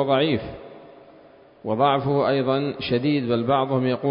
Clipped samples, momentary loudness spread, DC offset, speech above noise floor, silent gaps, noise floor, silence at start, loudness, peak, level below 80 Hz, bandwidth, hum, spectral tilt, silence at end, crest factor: under 0.1%; 15 LU; under 0.1%; 28 dB; none; -50 dBFS; 0 s; -22 LUFS; -6 dBFS; -54 dBFS; 5.4 kHz; none; -11.5 dB/octave; 0 s; 16 dB